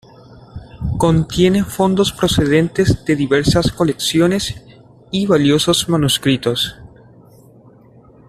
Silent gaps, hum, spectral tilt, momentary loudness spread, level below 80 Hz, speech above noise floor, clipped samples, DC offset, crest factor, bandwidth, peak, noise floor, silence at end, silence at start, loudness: none; none; -5 dB/octave; 10 LU; -36 dBFS; 30 dB; under 0.1%; under 0.1%; 14 dB; 14.5 kHz; -2 dBFS; -45 dBFS; 1.4 s; 0.3 s; -15 LUFS